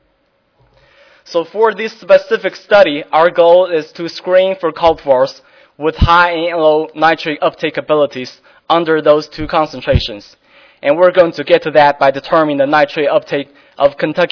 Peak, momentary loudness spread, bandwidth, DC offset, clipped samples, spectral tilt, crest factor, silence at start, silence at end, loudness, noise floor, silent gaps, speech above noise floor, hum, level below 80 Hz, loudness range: 0 dBFS; 11 LU; 5.4 kHz; under 0.1%; 0.4%; -6.5 dB/octave; 12 dB; 1.3 s; 0.05 s; -13 LUFS; -59 dBFS; none; 47 dB; none; -32 dBFS; 3 LU